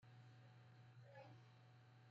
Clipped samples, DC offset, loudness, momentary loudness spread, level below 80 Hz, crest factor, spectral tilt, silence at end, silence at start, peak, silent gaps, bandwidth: under 0.1%; under 0.1%; -66 LUFS; 5 LU; under -90 dBFS; 14 dB; -5.5 dB/octave; 0 s; 0 s; -50 dBFS; none; 7.4 kHz